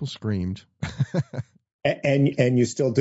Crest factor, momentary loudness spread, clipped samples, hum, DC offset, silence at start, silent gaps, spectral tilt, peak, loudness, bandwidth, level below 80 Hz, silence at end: 20 dB; 14 LU; under 0.1%; none; under 0.1%; 0 s; 1.73-1.79 s; -6.5 dB/octave; -4 dBFS; -24 LUFS; 8 kHz; -54 dBFS; 0 s